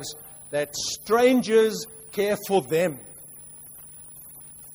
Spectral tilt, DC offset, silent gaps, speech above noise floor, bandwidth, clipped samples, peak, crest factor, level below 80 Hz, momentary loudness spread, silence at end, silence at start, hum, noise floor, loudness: -4 dB/octave; under 0.1%; none; 21 dB; over 20 kHz; under 0.1%; -8 dBFS; 18 dB; -62 dBFS; 22 LU; 0 s; 0 s; none; -44 dBFS; -24 LUFS